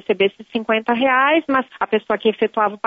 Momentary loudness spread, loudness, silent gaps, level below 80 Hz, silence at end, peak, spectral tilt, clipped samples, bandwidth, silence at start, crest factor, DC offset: 6 LU; -18 LUFS; none; -64 dBFS; 0 s; -4 dBFS; -7 dB/octave; under 0.1%; 5 kHz; 0.1 s; 14 dB; under 0.1%